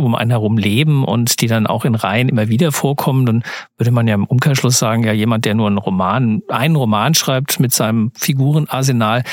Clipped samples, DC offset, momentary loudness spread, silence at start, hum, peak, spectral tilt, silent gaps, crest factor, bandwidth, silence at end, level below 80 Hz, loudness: under 0.1%; under 0.1%; 3 LU; 0 s; none; 0 dBFS; -5 dB/octave; none; 14 dB; 17 kHz; 0 s; -58 dBFS; -15 LUFS